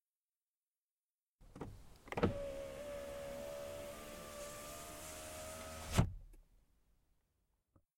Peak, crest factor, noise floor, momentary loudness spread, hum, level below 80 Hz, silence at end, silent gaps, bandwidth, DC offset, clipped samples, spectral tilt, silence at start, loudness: -18 dBFS; 28 dB; under -90 dBFS; 15 LU; none; -56 dBFS; 1.4 s; none; 16.5 kHz; under 0.1%; under 0.1%; -5 dB/octave; 1.4 s; -44 LUFS